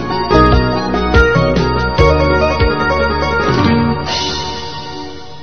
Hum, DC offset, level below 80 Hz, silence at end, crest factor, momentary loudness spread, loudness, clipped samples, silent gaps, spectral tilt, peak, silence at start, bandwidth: none; 3%; -22 dBFS; 0 s; 14 dB; 13 LU; -13 LUFS; under 0.1%; none; -6 dB/octave; 0 dBFS; 0 s; 6.6 kHz